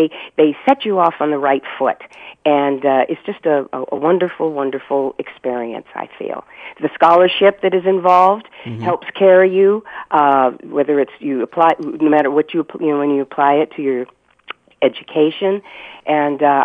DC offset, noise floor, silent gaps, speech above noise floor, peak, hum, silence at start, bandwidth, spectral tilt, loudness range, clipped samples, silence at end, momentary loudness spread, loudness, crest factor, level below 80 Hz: under 0.1%; -37 dBFS; none; 22 dB; 0 dBFS; none; 0 s; 6 kHz; -7.5 dB/octave; 5 LU; under 0.1%; 0 s; 15 LU; -16 LUFS; 16 dB; -64 dBFS